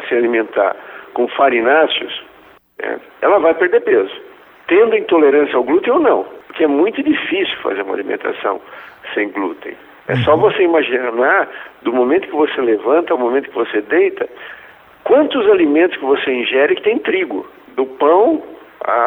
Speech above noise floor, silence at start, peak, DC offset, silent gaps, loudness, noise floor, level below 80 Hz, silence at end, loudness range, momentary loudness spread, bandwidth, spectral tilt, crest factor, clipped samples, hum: 31 dB; 0 s; 0 dBFS; under 0.1%; none; -15 LUFS; -45 dBFS; -58 dBFS; 0 s; 4 LU; 14 LU; 4 kHz; -8 dB/octave; 16 dB; under 0.1%; none